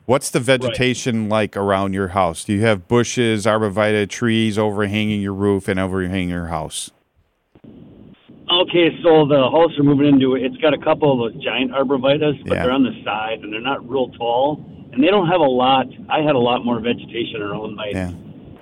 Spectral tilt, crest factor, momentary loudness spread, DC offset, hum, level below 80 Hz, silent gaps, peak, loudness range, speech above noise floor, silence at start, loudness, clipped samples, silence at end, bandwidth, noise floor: -5.5 dB/octave; 16 dB; 10 LU; under 0.1%; none; -50 dBFS; none; -2 dBFS; 6 LU; 45 dB; 0.1 s; -18 LUFS; under 0.1%; 0.1 s; 15.5 kHz; -63 dBFS